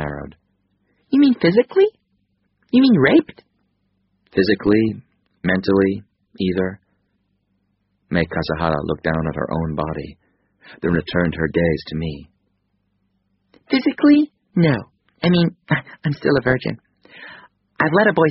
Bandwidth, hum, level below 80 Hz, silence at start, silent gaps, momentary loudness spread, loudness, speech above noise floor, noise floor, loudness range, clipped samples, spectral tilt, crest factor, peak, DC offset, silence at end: 5.8 kHz; none; -44 dBFS; 0 s; none; 15 LU; -19 LUFS; 51 dB; -68 dBFS; 6 LU; under 0.1%; -5.5 dB/octave; 18 dB; -2 dBFS; under 0.1%; 0 s